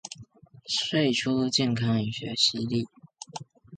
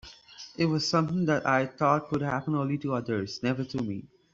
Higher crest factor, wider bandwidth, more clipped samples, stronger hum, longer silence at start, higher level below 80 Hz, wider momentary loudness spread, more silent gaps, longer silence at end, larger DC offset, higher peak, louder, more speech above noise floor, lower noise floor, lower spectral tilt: about the same, 20 dB vs 20 dB; first, 9.6 kHz vs 7.8 kHz; neither; neither; about the same, 0.05 s vs 0.05 s; about the same, -62 dBFS vs -62 dBFS; first, 19 LU vs 11 LU; neither; second, 0 s vs 0.25 s; neither; about the same, -10 dBFS vs -8 dBFS; about the same, -26 LUFS vs -28 LUFS; first, 25 dB vs 21 dB; about the same, -51 dBFS vs -49 dBFS; second, -4.5 dB/octave vs -6 dB/octave